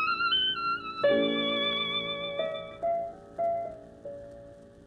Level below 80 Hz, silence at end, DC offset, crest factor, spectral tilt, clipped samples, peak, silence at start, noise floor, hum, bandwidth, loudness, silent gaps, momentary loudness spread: -62 dBFS; 0 s; under 0.1%; 16 dB; -5 dB/octave; under 0.1%; -14 dBFS; 0 s; -50 dBFS; none; 9.2 kHz; -29 LUFS; none; 19 LU